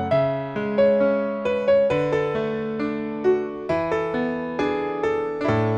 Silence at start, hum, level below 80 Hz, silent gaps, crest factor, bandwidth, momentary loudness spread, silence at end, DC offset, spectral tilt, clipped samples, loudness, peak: 0 s; none; -54 dBFS; none; 14 dB; 8 kHz; 7 LU; 0 s; under 0.1%; -8 dB/octave; under 0.1%; -23 LUFS; -8 dBFS